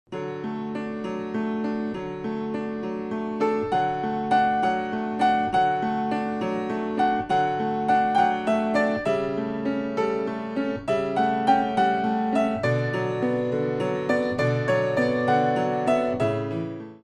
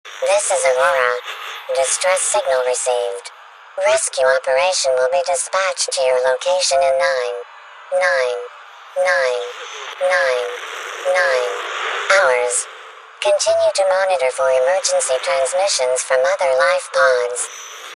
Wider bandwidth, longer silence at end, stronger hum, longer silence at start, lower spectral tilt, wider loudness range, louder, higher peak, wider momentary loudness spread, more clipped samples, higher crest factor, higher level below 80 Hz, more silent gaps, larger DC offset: second, 10.5 kHz vs 12.5 kHz; about the same, 0.05 s vs 0 s; neither; about the same, 0.1 s vs 0.05 s; first, -7 dB/octave vs 1.5 dB/octave; about the same, 3 LU vs 3 LU; second, -25 LUFS vs -17 LUFS; second, -8 dBFS vs 0 dBFS; second, 9 LU vs 12 LU; neither; about the same, 16 dB vs 18 dB; first, -56 dBFS vs -68 dBFS; neither; neither